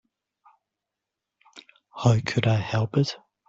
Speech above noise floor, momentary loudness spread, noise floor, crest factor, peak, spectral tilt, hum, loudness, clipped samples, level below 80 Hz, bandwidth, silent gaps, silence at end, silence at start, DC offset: 63 dB; 6 LU; -86 dBFS; 20 dB; -8 dBFS; -6.5 dB/octave; none; -24 LUFS; under 0.1%; -56 dBFS; 7.8 kHz; none; 0.3 s; 1.55 s; under 0.1%